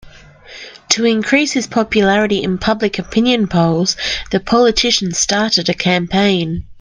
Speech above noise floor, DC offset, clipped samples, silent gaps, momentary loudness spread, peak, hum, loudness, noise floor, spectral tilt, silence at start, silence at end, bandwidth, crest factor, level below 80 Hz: 24 dB; under 0.1%; under 0.1%; none; 6 LU; 0 dBFS; none; -14 LUFS; -39 dBFS; -4 dB/octave; 0.05 s; 0 s; 10.5 kHz; 16 dB; -40 dBFS